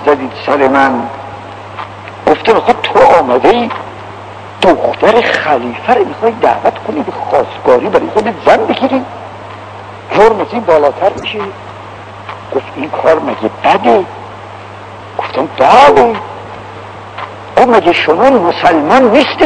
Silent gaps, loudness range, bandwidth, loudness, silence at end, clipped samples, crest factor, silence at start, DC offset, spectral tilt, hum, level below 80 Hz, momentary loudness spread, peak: none; 4 LU; 11 kHz; -10 LUFS; 0 s; 3%; 10 dB; 0 s; under 0.1%; -5.5 dB/octave; none; -44 dBFS; 20 LU; 0 dBFS